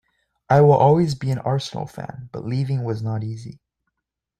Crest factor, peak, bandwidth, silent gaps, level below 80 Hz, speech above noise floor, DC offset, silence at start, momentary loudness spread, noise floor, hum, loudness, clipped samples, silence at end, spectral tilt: 18 dB; -4 dBFS; 10 kHz; none; -54 dBFS; 62 dB; under 0.1%; 0.5 s; 19 LU; -82 dBFS; none; -20 LUFS; under 0.1%; 0.85 s; -8 dB/octave